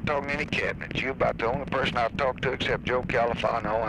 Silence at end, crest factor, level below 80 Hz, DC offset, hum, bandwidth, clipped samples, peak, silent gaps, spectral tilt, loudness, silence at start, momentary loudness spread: 0 s; 16 dB; -44 dBFS; under 0.1%; none; 11 kHz; under 0.1%; -12 dBFS; none; -6 dB/octave; -27 LUFS; 0 s; 3 LU